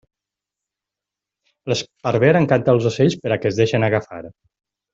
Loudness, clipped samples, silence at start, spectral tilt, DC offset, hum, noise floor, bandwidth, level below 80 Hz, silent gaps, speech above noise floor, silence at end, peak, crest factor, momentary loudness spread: -18 LUFS; under 0.1%; 1.65 s; -6.5 dB/octave; under 0.1%; none; -86 dBFS; 7.8 kHz; -56 dBFS; none; 68 dB; 0.65 s; -2 dBFS; 18 dB; 11 LU